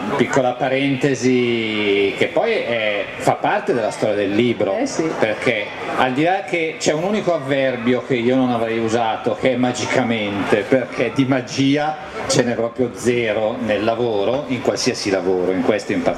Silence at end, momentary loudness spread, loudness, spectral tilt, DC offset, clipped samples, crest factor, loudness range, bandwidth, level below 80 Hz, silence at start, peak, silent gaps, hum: 0 s; 3 LU; -19 LUFS; -5 dB/octave; under 0.1%; under 0.1%; 18 dB; 1 LU; 13 kHz; -54 dBFS; 0 s; 0 dBFS; none; none